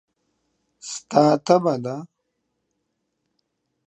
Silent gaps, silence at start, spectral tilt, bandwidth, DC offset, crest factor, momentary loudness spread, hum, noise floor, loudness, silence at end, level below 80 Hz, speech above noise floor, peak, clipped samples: none; 0.85 s; -6 dB/octave; 9.8 kHz; under 0.1%; 24 dB; 17 LU; none; -76 dBFS; -19 LUFS; 1.8 s; -74 dBFS; 57 dB; -2 dBFS; under 0.1%